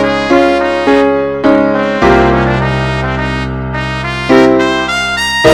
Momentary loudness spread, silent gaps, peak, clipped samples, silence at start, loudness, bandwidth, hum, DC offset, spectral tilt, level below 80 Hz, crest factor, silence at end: 8 LU; none; 0 dBFS; 1%; 0 s; -11 LUFS; 15 kHz; none; under 0.1%; -5.5 dB/octave; -26 dBFS; 10 dB; 0 s